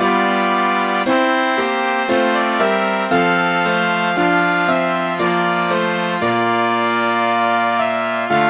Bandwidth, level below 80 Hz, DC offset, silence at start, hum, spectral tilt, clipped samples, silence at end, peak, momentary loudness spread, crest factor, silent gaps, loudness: 4 kHz; -58 dBFS; under 0.1%; 0 s; none; -9 dB/octave; under 0.1%; 0 s; -2 dBFS; 2 LU; 14 dB; none; -16 LUFS